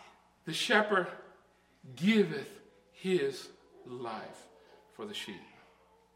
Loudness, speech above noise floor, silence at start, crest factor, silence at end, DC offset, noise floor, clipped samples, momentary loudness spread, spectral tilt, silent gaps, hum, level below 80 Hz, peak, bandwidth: -32 LUFS; 33 dB; 0 s; 22 dB; 0.7 s; under 0.1%; -65 dBFS; under 0.1%; 22 LU; -4.5 dB/octave; none; 60 Hz at -65 dBFS; -78 dBFS; -12 dBFS; 16 kHz